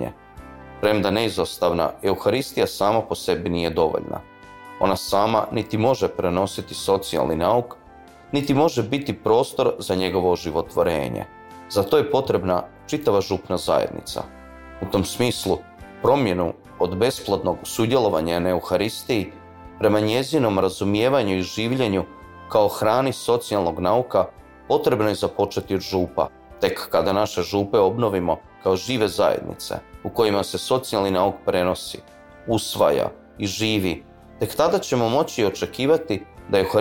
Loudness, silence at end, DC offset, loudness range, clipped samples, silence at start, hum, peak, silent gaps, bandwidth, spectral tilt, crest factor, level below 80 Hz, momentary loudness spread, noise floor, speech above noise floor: -22 LUFS; 0 s; under 0.1%; 2 LU; under 0.1%; 0 s; none; -6 dBFS; none; 17 kHz; -5.5 dB/octave; 16 dB; -50 dBFS; 10 LU; -46 dBFS; 25 dB